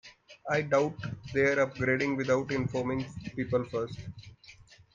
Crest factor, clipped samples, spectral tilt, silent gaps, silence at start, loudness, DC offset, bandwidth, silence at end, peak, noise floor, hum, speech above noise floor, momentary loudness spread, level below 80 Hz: 18 dB; under 0.1%; -6.5 dB/octave; none; 0.05 s; -30 LUFS; under 0.1%; 7.6 kHz; 0.4 s; -14 dBFS; -55 dBFS; none; 26 dB; 17 LU; -60 dBFS